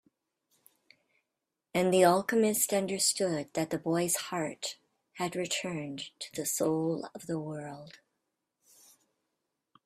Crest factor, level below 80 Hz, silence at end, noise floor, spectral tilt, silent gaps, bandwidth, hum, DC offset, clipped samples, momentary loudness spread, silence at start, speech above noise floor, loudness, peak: 24 dB; -74 dBFS; 1.95 s; -87 dBFS; -3.5 dB/octave; none; 15.5 kHz; none; under 0.1%; under 0.1%; 15 LU; 1.75 s; 56 dB; -30 LUFS; -10 dBFS